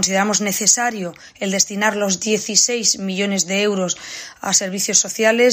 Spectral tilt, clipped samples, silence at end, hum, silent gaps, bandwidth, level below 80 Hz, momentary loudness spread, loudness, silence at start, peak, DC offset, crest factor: -2 dB/octave; under 0.1%; 0 s; none; none; 15.5 kHz; -64 dBFS; 11 LU; -17 LUFS; 0 s; 0 dBFS; under 0.1%; 18 dB